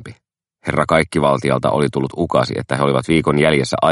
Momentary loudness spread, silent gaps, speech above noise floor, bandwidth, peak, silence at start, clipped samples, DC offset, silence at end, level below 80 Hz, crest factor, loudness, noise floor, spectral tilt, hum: 6 LU; none; 46 dB; 11.5 kHz; 0 dBFS; 0 s; under 0.1%; under 0.1%; 0 s; -44 dBFS; 16 dB; -17 LUFS; -62 dBFS; -6 dB/octave; none